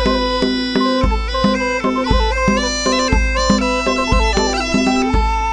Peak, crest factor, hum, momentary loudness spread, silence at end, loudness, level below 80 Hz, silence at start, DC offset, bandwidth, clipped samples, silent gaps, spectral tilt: -2 dBFS; 14 dB; none; 2 LU; 0 s; -16 LUFS; -22 dBFS; 0 s; under 0.1%; 10 kHz; under 0.1%; none; -4.5 dB/octave